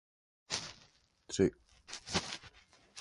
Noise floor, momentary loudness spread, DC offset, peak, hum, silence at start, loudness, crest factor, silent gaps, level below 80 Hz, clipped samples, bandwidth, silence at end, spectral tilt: -67 dBFS; 21 LU; under 0.1%; -16 dBFS; none; 0.5 s; -37 LUFS; 24 dB; none; -60 dBFS; under 0.1%; 11.5 kHz; 0 s; -4 dB/octave